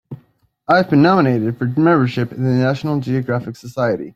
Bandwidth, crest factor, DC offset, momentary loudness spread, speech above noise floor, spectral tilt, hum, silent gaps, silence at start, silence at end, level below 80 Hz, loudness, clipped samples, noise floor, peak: 13 kHz; 16 dB; under 0.1%; 10 LU; 38 dB; -8.5 dB/octave; none; none; 0.1 s; 0.05 s; -56 dBFS; -16 LUFS; under 0.1%; -54 dBFS; -2 dBFS